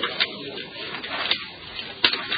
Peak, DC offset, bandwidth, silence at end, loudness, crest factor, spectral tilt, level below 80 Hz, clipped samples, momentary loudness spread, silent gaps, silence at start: -2 dBFS; under 0.1%; 5.2 kHz; 0 s; -26 LUFS; 26 dB; -6.5 dB/octave; -60 dBFS; under 0.1%; 12 LU; none; 0 s